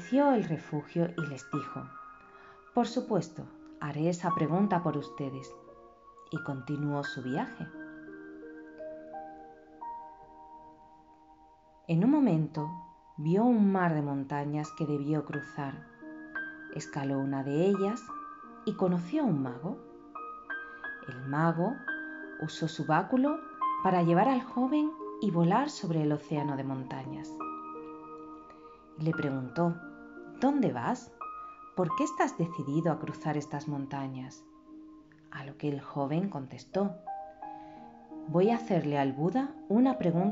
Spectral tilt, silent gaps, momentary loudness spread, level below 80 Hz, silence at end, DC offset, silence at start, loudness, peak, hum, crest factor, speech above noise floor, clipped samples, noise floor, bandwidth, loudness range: -7 dB/octave; none; 20 LU; -70 dBFS; 0 s; under 0.1%; 0 s; -32 LUFS; -14 dBFS; none; 18 dB; 29 dB; under 0.1%; -59 dBFS; 7.6 kHz; 9 LU